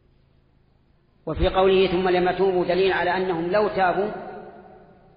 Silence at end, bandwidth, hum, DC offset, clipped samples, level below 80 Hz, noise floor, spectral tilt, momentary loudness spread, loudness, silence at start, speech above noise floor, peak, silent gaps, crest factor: 0.55 s; 5.2 kHz; none; under 0.1%; under 0.1%; -40 dBFS; -60 dBFS; -4 dB/octave; 16 LU; -21 LUFS; 1.25 s; 39 dB; -8 dBFS; none; 14 dB